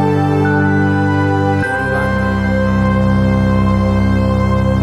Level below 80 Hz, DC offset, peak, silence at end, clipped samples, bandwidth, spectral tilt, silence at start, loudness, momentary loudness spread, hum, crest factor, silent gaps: -26 dBFS; under 0.1%; -2 dBFS; 0 s; under 0.1%; 10 kHz; -8 dB/octave; 0 s; -14 LUFS; 2 LU; none; 12 dB; none